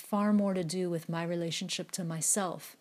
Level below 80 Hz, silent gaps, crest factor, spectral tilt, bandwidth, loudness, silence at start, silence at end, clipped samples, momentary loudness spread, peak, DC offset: -80 dBFS; none; 14 dB; -4 dB/octave; 15.5 kHz; -32 LUFS; 0 s; 0.05 s; under 0.1%; 7 LU; -18 dBFS; under 0.1%